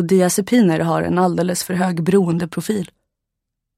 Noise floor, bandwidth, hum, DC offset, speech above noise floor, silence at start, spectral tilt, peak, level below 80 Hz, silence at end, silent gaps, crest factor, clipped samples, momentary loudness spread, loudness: -80 dBFS; 15.5 kHz; none; under 0.1%; 63 dB; 0 s; -6 dB/octave; -4 dBFS; -54 dBFS; 0.9 s; none; 14 dB; under 0.1%; 8 LU; -18 LUFS